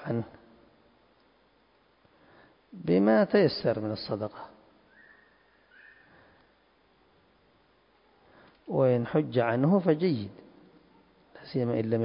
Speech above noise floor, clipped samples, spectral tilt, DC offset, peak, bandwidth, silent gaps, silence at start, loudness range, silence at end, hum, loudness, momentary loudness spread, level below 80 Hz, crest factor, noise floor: 39 dB; under 0.1%; -11 dB/octave; under 0.1%; -10 dBFS; 5.4 kHz; none; 0 s; 8 LU; 0 s; none; -27 LUFS; 20 LU; -68 dBFS; 20 dB; -65 dBFS